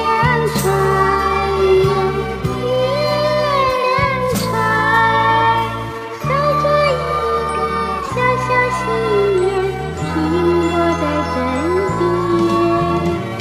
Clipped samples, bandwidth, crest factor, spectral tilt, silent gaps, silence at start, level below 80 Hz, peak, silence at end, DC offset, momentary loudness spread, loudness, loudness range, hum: under 0.1%; 15.5 kHz; 14 dB; -6 dB/octave; none; 0 s; -34 dBFS; -2 dBFS; 0 s; under 0.1%; 6 LU; -16 LUFS; 2 LU; none